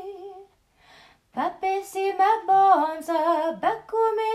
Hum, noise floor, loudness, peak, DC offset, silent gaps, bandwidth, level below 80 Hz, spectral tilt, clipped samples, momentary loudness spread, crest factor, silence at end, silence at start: none; -57 dBFS; -23 LUFS; -6 dBFS; under 0.1%; none; 14 kHz; -68 dBFS; -4 dB/octave; under 0.1%; 17 LU; 18 dB; 0 s; 0 s